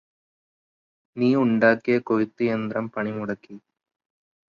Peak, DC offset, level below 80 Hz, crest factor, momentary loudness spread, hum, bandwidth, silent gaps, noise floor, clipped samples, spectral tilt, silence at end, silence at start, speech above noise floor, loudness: -4 dBFS; under 0.1%; -66 dBFS; 20 dB; 13 LU; none; 6.8 kHz; none; under -90 dBFS; under 0.1%; -8.5 dB/octave; 0.95 s; 1.15 s; over 67 dB; -23 LUFS